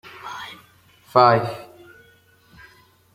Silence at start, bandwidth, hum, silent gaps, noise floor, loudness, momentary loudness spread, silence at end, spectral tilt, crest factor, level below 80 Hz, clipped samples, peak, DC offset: 0.25 s; 16 kHz; none; none; -55 dBFS; -18 LUFS; 22 LU; 1.5 s; -6.5 dB/octave; 22 dB; -64 dBFS; under 0.1%; -2 dBFS; under 0.1%